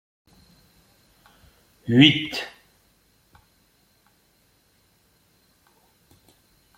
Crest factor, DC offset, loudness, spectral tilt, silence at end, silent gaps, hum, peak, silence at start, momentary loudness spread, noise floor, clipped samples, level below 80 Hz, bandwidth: 26 dB; under 0.1%; -18 LUFS; -5.5 dB/octave; 4.3 s; none; none; -2 dBFS; 1.85 s; 23 LU; -63 dBFS; under 0.1%; -62 dBFS; 16 kHz